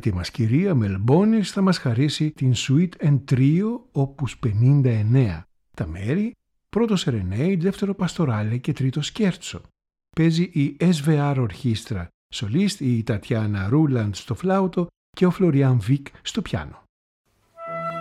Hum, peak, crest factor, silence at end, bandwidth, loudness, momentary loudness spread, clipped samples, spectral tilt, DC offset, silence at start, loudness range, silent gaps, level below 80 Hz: none; -6 dBFS; 16 dB; 0 s; 12 kHz; -22 LUFS; 11 LU; under 0.1%; -7 dB/octave; under 0.1%; 0.05 s; 3 LU; 12.14-12.30 s, 14.96-15.13 s, 16.89-17.24 s; -50 dBFS